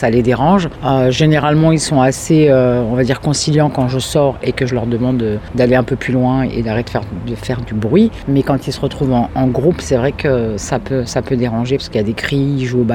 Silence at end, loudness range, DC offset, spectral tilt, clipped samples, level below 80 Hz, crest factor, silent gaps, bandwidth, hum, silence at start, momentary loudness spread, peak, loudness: 0 s; 4 LU; under 0.1%; -6 dB/octave; under 0.1%; -34 dBFS; 14 dB; none; 14 kHz; none; 0 s; 7 LU; 0 dBFS; -15 LUFS